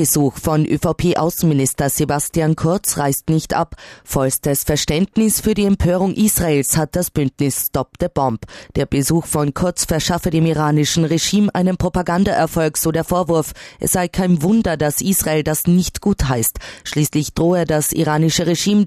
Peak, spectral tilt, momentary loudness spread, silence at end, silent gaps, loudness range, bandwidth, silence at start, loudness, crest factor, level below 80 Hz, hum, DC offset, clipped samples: -4 dBFS; -5 dB/octave; 4 LU; 0 s; none; 2 LU; 14 kHz; 0 s; -17 LUFS; 14 dB; -36 dBFS; none; under 0.1%; under 0.1%